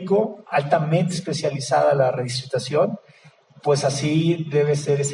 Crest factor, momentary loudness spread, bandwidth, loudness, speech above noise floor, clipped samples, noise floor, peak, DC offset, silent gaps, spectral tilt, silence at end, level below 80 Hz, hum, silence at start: 18 dB; 6 LU; 11 kHz; -21 LUFS; 30 dB; under 0.1%; -51 dBFS; -4 dBFS; under 0.1%; none; -5.5 dB/octave; 0 s; -64 dBFS; none; 0 s